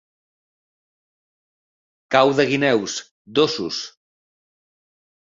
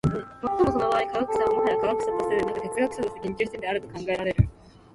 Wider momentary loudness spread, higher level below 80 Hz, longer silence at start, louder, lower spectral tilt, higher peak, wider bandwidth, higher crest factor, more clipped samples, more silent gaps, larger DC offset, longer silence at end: first, 12 LU vs 7 LU; second, -64 dBFS vs -42 dBFS; first, 2.1 s vs 0.05 s; first, -20 LUFS vs -26 LUFS; second, -4 dB/octave vs -7 dB/octave; first, -2 dBFS vs -6 dBFS; second, 7.6 kHz vs 11.5 kHz; about the same, 22 dB vs 18 dB; neither; first, 3.11-3.25 s vs none; neither; first, 1.45 s vs 0.45 s